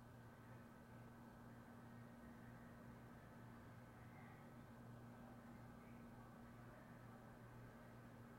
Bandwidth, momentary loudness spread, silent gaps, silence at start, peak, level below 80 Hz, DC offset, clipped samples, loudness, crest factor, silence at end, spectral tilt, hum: 16 kHz; 1 LU; none; 0 s; -48 dBFS; -74 dBFS; under 0.1%; under 0.1%; -61 LUFS; 12 dB; 0 s; -7 dB/octave; none